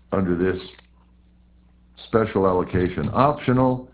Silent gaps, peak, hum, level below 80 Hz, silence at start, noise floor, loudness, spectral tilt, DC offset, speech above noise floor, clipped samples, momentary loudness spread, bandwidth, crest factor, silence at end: none; -2 dBFS; none; -42 dBFS; 0.1 s; -54 dBFS; -22 LUFS; -11.5 dB/octave; under 0.1%; 33 dB; under 0.1%; 9 LU; 4 kHz; 20 dB; 0.1 s